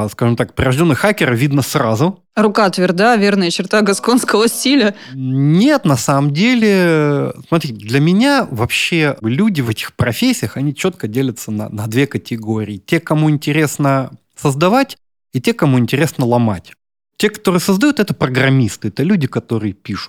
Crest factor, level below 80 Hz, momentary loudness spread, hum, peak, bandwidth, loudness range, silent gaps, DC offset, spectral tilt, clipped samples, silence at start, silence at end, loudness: 14 dB; -46 dBFS; 8 LU; none; -2 dBFS; 18 kHz; 4 LU; none; under 0.1%; -5.5 dB/octave; under 0.1%; 0 s; 0 s; -15 LUFS